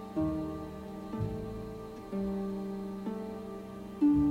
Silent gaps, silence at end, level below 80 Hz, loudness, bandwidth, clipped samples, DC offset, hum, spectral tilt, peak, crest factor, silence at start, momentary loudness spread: none; 0 s; -50 dBFS; -36 LUFS; 15 kHz; under 0.1%; under 0.1%; none; -9 dB/octave; -18 dBFS; 16 dB; 0 s; 13 LU